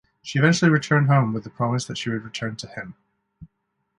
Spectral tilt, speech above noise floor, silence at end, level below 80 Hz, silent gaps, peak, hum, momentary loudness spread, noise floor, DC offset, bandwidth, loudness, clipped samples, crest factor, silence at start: -6 dB/octave; 53 dB; 0.55 s; -60 dBFS; none; -4 dBFS; none; 16 LU; -75 dBFS; under 0.1%; 11 kHz; -22 LUFS; under 0.1%; 20 dB; 0.25 s